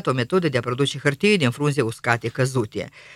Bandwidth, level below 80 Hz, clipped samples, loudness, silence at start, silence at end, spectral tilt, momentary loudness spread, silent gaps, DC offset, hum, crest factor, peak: 14.5 kHz; -58 dBFS; under 0.1%; -22 LUFS; 0.05 s; 0 s; -5.5 dB/octave; 6 LU; none; under 0.1%; none; 20 dB; -2 dBFS